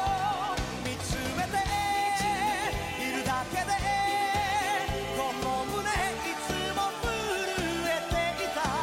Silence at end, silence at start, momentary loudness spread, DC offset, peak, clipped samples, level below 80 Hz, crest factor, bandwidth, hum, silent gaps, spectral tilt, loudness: 0 s; 0 s; 4 LU; under 0.1%; -18 dBFS; under 0.1%; -44 dBFS; 12 dB; 16.5 kHz; none; none; -3.5 dB/octave; -29 LUFS